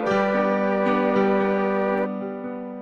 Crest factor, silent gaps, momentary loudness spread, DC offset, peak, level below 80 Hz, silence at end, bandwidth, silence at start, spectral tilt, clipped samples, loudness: 14 dB; none; 10 LU; under 0.1%; -10 dBFS; -62 dBFS; 0 s; 7 kHz; 0 s; -8 dB/octave; under 0.1%; -22 LUFS